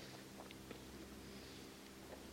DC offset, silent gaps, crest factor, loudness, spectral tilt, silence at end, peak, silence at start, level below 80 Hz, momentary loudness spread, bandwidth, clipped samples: under 0.1%; none; 18 dB; -55 LUFS; -4 dB/octave; 0 s; -36 dBFS; 0 s; -68 dBFS; 1 LU; 16.5 kHz; under 0.1%